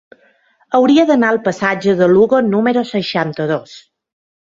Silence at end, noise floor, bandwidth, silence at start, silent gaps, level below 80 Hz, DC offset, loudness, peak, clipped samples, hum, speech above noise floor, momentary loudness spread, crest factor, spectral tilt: 0.7 s; -55 dBFS; 7.6 kHz; 0.7 s; none; -56 dBFS; under 0.1%; -14 LUFS; 0 dBFS; under 0.1%; none; 41 dB; 8 LU; 14 dB; -6.5 dB/octave